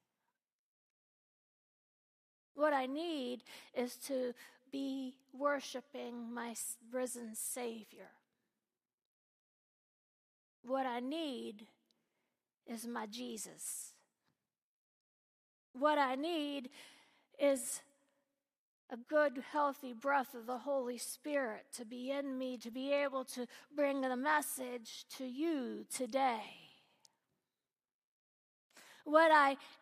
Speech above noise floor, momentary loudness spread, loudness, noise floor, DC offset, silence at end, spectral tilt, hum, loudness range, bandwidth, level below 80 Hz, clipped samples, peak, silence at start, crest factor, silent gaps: over 52 dB; 14 LU; -38 LUFS; under -90 dBFS; under 0.1%; 0.05 s; -2 dB/octave; none; 9 LU; 15 kHz; under -90 dBFS; under 0.1%; -14 dBFS; 2.55 s; 26 dB; 8.94-8.98 s, 9.05-10.63 s, 14.58-15.74 s, 18.58-18.88 s, 27.94-28.70 s